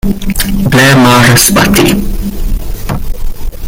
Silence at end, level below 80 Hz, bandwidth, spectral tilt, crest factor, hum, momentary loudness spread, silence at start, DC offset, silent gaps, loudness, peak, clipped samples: 0 s; -16 dBFS; over 20 kHz; -4 dB/octave; 8 dB; none; 16 LU; 0.05 s; under 0.1%; none; -7 LUFS; 0 dBFS; 0.7%